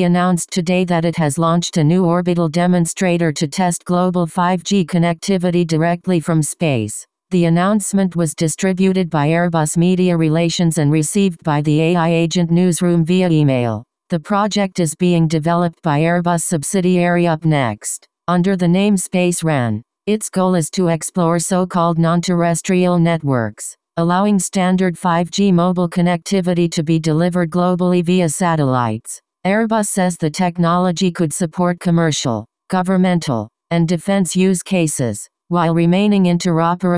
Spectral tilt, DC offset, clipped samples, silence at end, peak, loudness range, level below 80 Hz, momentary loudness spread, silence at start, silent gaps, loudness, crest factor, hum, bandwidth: -6 dB/octave; under 0.1%; under 0.1%; 0 s; -2 dBFS; 2 LU; -52 dBFS; 5 LU; 0 s; none; -16 LUFS; 14 dB; none; 11 kHz